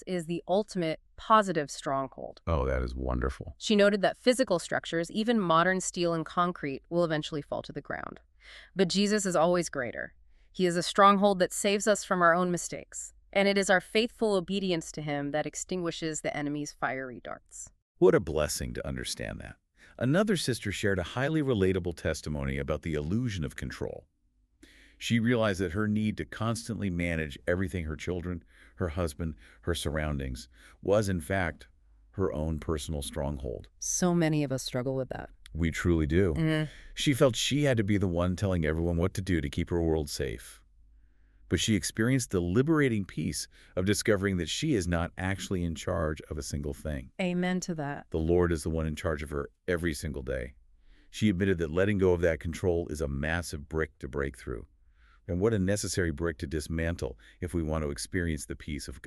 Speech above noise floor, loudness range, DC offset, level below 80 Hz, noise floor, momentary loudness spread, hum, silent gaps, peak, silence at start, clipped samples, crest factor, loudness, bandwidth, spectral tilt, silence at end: 39 dB; 6 LU; under 0.1%; -44 dBFS; -68 dBFS; 13 LU; none; 17.82-17.95 s; -8 dBFS; 0 s; under 0.1%; 22 dB; -30 LUFS; 13.5 kHz; -5 dB/octave; 0 s